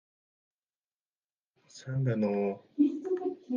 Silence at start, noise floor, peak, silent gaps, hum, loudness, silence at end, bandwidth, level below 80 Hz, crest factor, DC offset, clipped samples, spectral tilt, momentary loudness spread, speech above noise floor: 1.75 s; under -90 dBFS; -14 dBFS; none; none; -31 LUFS; 0 s; 7.4 kHz; -80 dBFS; 18 dB; under 0.1%; under 0.1%; -8.5 dB/octave; 7 LU; over 60 dB